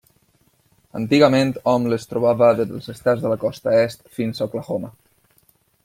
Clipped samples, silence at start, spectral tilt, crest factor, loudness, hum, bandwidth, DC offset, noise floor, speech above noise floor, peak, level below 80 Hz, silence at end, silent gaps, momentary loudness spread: under 0.1%; 0.95 s; -6.5 dB/octave; 18 dB; -20 LUFS; none; 16 kHz; under 0.1%; -61 dBFS; 42 dB; -2 dBFS; -58 dBFS; 0.95 s; none; 12 LU